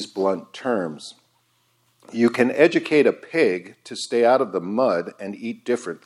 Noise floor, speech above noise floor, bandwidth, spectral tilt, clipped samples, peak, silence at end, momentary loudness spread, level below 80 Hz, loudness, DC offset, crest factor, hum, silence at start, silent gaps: -65 dBFS; 44 dB; 12 kHz; -5 dB/octave; under 0.1%; -2 dBFS; 0.1 s; 14 LU; -76 dBFS; -21 LUFS; under 0.1%; 20 dB; none; 0 s; none